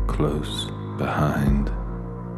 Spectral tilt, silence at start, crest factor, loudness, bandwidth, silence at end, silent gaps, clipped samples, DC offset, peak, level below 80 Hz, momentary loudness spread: -6.5 dB/octave; 0 s; 14 dB; -25 LUFS; 13.5 kHz; 0 s; none; under 0.1%; under 0.1%; -10 dBFS; -30 dBFS; 10 LU